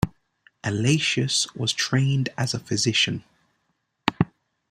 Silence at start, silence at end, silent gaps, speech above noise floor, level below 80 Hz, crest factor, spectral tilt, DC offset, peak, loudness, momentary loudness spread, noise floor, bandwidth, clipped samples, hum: 0 s; 0.45 s; none; 50 dB; -52 dBFS; 24 dB; -4 dB/octave; under 0.1%; -2 dBFS; -23 LUFS; 8 LU; -74 dBFS; 14.5 kHz; under 0.1%; none